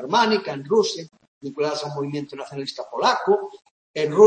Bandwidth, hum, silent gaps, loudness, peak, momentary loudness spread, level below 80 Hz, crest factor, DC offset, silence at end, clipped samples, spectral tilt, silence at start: 8.8 kHz; none; 1.27-1.41 s, 3.71-3.94 s; -24 LUFS; -2 dBFS; 15 LU; -72 dBFS; 20 dB; under 0.1%; 0 s; under 0.1%; -4.5 dB/octave; 0 s